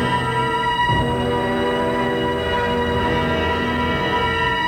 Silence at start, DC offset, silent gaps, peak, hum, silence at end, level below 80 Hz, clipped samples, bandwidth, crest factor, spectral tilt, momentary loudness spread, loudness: 0 s; under 0.1%; none; -8 dBFS; none; 0 s; -36 dBFS; under 0.1%; 20 kHz; 12 dB; -6 dB/octave; 2 LU; -19 LUFS